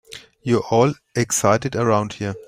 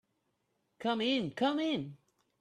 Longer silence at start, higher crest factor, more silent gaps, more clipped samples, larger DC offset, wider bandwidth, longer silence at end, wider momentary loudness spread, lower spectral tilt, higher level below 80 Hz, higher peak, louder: second, 0.1 s vs 0.8 s; about the same, 18 dB vs 16 dB; neither; neither; neither; first, 16 kHz vs 10 kHz; second, 0.05 s vs 0.45 s; about the same, 9 LU vs 8 LU; about the same, -5 dB/octave vs -5.5 dB/octave; first, -54 dBFS vs -76 dBFS; first, -2 dBFS vs -20 dBFS; first, -20 LUFS vs -33 LUFS